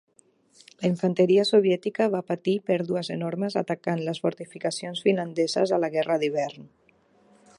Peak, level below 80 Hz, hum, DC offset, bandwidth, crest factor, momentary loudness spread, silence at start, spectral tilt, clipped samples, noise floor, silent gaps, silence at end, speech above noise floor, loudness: -8 dBFS; -76 dBFS; none; under 0.1%; 11.5 kHz; 18 dB; 10 LU; 0.8 s; -6 dB/octave; under 0.1%; -62 dBFS; none; 0.95 s; 37 dB; -25 LUFS